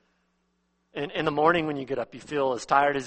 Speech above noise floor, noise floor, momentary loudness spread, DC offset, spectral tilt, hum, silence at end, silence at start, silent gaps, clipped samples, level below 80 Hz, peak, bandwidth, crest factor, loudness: 47 dB; -73 dBFS; 10 LU; under 0.1%; -5 dB/octave; none; 0 s; 0.95 s; none; under 0.1%; -62 dBFS; -6 dBFS; 8.4 kHz; 22 dB; -26 LUFS